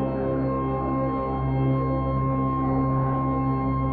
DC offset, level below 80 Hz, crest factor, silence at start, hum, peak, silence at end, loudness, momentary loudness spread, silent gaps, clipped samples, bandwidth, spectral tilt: under 0.1%; -36 dBFS; 10 dB; 0 s; none; -14 dBFS; 0 s; -25 LUFS; 2 LU; none; under 0.1%; 4.5 kHz; -12.5 dB/octave